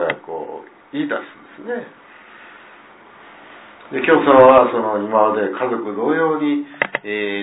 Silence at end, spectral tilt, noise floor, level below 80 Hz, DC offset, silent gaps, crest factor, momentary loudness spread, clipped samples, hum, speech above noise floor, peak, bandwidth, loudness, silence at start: 0 s; -9.5 dB/octave; -44 dBFS; -58 dBFS; under 0.1%; none; 18 dB; 20 LU; under 0.1%; none; 28 dB; 0 dBFS; 4 kHz; -17 LUFS; 0 s